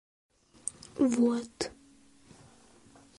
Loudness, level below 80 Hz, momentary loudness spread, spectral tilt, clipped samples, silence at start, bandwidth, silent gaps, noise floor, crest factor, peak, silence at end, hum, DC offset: -31 LUFS; -66 dBFS; 14 LU; -4 dB/octave; under 0.1%; 0.65 s; 11.5 kHz; none; -60 dBFS; 20 dB; -14 dBFS; 1.5 s; none; under 0.1%